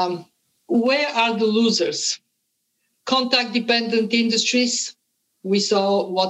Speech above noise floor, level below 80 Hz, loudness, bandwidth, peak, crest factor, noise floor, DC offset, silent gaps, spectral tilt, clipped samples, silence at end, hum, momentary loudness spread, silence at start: 53 dB; -80 dBFS; -20 LUFS; 9.8 kHz; -4 dBFS; 16 dB; -73 dBFS; under 0.1%; none; -3 dB/octave; under 0.1%; 0 s; none; 8 LU; 0 s